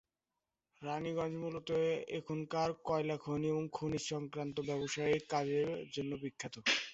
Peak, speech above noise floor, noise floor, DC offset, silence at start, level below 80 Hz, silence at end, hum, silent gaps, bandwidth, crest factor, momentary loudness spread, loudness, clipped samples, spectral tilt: -20 dBFS; over 53 dB; under -90 dBFS; under 0.1%; 0.8 s; -70 dBFS; 0 s; none; none; 8 kHz; 18 dB; 7 LU; -38 LUFS; under 0.1%; -4 dB/octave